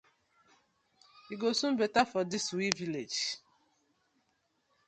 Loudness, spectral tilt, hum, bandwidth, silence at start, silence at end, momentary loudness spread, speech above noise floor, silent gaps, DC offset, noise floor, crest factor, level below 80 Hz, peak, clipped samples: -32 LUFS; -3 dB/octave; none; 11 kHz; 1.15 s; 1.5 s; 7 LU; 45 dB; none; under 0.1%; -77 dBFS; 30 dB; -74 dBFS; -6 dBFS; under 0.1%